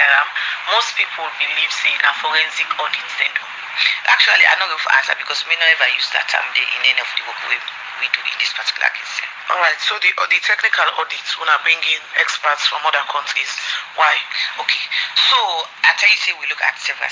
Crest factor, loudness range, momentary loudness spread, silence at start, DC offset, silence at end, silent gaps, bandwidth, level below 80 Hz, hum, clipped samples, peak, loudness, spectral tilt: 18 dB; 4 LU; 8 LU; 0 s; under 0.1%; 0 s; none; 7.8 kHz; -76 dBFS; none; under 0.1%; 0 dBFS; -15 LUFS; 2.5 dB/octave